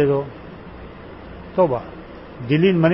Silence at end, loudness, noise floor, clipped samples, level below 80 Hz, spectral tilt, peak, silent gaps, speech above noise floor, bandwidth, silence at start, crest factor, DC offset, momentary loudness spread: 0 s; -20 LUFS; -37 dBFS; under 0.1%; -46 dBFS; -12 dB/octave; -4 dBFS; none; 20 dB; 5.8 kHz; 0 s; 18 dB; 0.1%; 21 LU